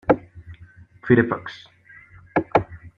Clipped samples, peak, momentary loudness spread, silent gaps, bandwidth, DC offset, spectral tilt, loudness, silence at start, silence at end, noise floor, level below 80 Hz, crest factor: under 0.1%; -2 dBFS; 24 LU; none; 6.8 kHz; under 0.1%; -9 dB/octave; -22 LUFS; 0.1 s; 0.1 s; -48 dBFS; -50 dBFS; 22 dB